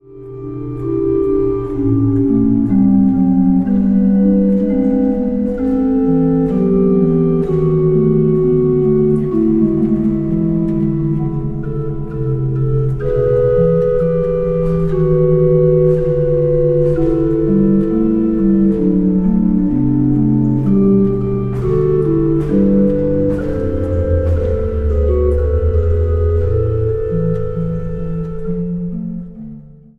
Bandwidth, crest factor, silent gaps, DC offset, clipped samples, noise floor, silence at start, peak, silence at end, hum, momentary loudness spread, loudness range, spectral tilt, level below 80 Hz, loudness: 3.6 kHz; 12 dB; none; under 0.1%; under 0.1%; -35 dBFS; 0.1 s; -2 dBFS; 0.25 s; none; 9 LU; 4 LU; -12 dB/octave; -26 dBFS; -15 LUFS